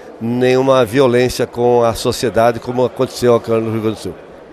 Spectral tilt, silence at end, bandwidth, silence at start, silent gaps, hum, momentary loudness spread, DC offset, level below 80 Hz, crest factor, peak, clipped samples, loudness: -5.5 dB/octave; 0 s; 13.5 kHz; 0 s; none; none; 8 LU; under 0.1%; -42 dBFS; 14 dB; 0 dBFS; under 0.1%; -14 LUFS